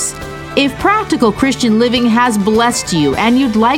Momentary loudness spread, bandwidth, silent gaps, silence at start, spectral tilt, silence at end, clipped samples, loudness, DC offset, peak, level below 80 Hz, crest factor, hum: 4 LU; 17 kHz; none; 0 s; -4 dB/octave; 0 s; under 0.1%; -12 LUFS; under 0.1%; 0 dBFS; -38 dBFS; 12 dB; none